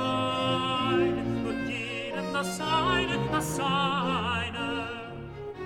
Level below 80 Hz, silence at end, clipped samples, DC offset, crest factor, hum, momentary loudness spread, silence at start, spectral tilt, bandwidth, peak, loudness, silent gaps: -50 dBFS; 0 s; under 0.1%; under 0.1%; 16 dB; none; 8 LU; 0 s; -4.5 dB/octave; 18.5 kHz; -14 dBFS; -28 LUFS; none